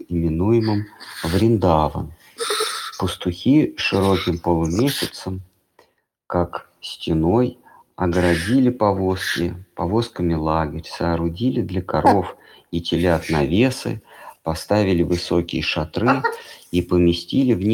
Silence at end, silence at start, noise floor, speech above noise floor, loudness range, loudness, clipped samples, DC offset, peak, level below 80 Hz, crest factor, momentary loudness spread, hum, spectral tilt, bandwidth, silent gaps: 0 s; 0 s; -62 dBFS; 42 dB; 3 LU; -20 LUFS; under 0.1%; under 0.1%; -2 dBFS; -40 dBFS; 18 dB; 11 LU; none; -6 dB/octave; 17.5 kHz; none